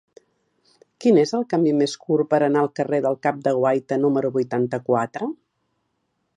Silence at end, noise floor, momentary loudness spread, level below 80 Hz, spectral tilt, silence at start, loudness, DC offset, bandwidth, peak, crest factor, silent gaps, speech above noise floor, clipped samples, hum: 1 s; -73 dBFS; 5 LU; -72 dBFS; -6.5 dB/octave; 1 s; -21 LUFS; under 0.1%; 10.5 kHz; -4 dBFS; 18 dB; none; 52 dB; under 0.1%; none